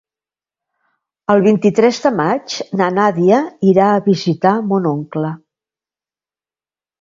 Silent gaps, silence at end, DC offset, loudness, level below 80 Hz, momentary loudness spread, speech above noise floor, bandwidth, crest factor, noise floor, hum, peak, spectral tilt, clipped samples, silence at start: none; 1.65 s; under 0.1%; -15 LUFS; -60 dBFS; 10 LU; over 76 dB; 7.6 kHz; 16 dB; under -90 dBFS; none; 0 dBFS; -6.5 dB/octave; under 0.1%; 1.3 s